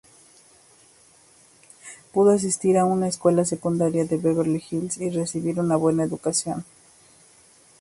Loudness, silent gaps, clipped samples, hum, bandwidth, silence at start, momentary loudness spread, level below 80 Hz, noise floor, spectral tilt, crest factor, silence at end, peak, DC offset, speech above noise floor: -23 LUFS; none; under 0.1%; none; 11.5 kHz; 1.85 s; 9 LU; -62 dBFS; -55 dBFS; -6 dB/octave; 18 dB; 1.2 s; -6 dBFS; under 0.1%; 33 dB